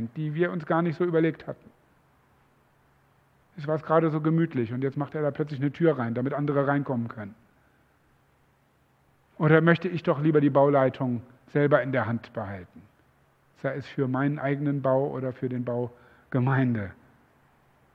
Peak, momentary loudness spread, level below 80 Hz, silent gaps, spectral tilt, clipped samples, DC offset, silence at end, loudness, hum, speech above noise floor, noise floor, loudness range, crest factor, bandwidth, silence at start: -4 dBFS; 14 LU; -68 dBFS; none; -10 dB/octave; under 0.1%; under 0.1%; 1 s; -26 LUFS; none; 39 dB; -65 dBFS; 6 LU; 22 dB; 5.8 kHz; 0 s